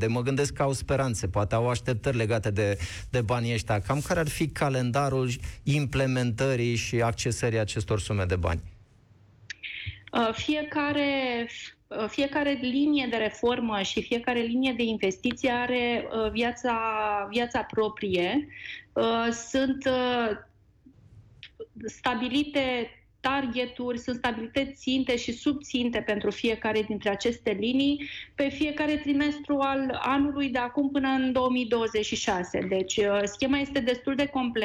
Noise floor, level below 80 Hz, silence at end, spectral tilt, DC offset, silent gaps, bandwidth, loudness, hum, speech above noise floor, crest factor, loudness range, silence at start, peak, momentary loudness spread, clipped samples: -58 dBFS; -48 dBFS; 0 s; -5.5 dB/octave; under 0.1%; none; 14.5 kHz; -28 LUFS; none; 31 dB; 12 dB; 3 LU; 0 s; -16 dBFS; 6 LU; under 0.1%